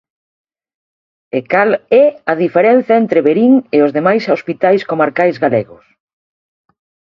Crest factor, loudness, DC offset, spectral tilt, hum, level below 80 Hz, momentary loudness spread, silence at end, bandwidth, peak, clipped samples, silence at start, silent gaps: 14 dB; -12 LUFS; under 0.1%; -8 dB/octave; none; -60 dBFS; 6 LU; 1.5 s; 6.6 kHz; 0 dBFS; under 0.1%; 1.35 s; none